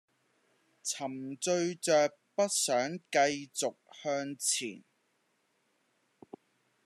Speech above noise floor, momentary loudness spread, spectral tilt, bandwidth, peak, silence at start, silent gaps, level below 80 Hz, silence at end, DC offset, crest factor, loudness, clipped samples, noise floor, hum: 44 dB; 9 LU; -2.5 dB/octave; 13.5 kHz; -14 dBFS; 0.85 s; none; -86 dBFS; 2.05 s; under 0.1%; 20 dB; -32 LUFS; under 0.1%; -76 dBFS; none